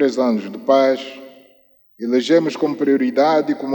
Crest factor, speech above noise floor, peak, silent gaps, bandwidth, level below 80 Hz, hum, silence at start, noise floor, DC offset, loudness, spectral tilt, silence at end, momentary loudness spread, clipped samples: 16 dB; 37 dB; -2 dBFS; none; 18 kHz; -76 dBFS; none; 0 s; -54 dBFS; under 0.1%; -17 LUFS; -5.5 dB/octave; 0 s; 8 LU; under 0.1%